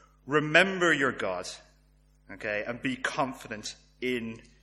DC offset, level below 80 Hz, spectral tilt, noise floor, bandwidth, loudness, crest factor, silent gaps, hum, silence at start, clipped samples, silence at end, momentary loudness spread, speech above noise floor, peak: under 0.1%; -60 dBFS; -4 dB/octave; -62 dBFS; 13.5 kHz; -28 LUFS; 24 dB; none; none; 0.25 s; under 0.1%; 0.2 s; 17 LU; 33 dB; -6 dBFS